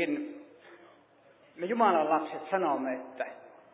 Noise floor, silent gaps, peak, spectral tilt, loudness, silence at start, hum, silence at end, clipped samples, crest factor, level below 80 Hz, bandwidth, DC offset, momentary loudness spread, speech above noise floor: -61 dBFS; none; -12 dBFS; -3.5 dB/octave; -30 LUFS; 0 s; none; 0.25 s; under 0.1%; 20 dB; under -90 dBFS; 4 kHz; under 0.1%; 16 LU; 31 dB